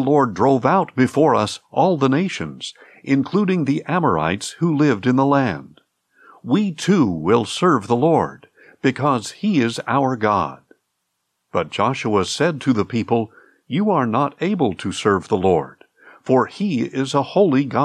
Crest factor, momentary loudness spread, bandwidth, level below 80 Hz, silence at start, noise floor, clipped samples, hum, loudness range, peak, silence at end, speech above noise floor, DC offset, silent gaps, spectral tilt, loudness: 16 dB; 8 LU; 12 kHz; -62 dBFS; 0 s; -74 dBFS; under 0.1%; none; 3 LU; -4 dBFS; 0 s; 56 dB; under 0.1%; none; -6 dB/octave; -19 LUFS